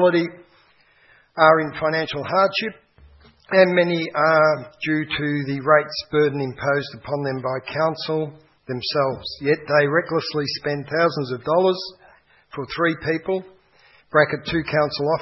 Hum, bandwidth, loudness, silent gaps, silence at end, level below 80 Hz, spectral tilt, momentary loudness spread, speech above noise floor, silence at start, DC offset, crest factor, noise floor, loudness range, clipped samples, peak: none; 6 kHz; -21 LUFS; none; 0 s; -56 dBFS; -7 dB/octave; 11 LU; 36 dB; 0 s; under 0.1%; 20 dB; -57 dBFS; 4 LU; under 0.1%; 0 dBFS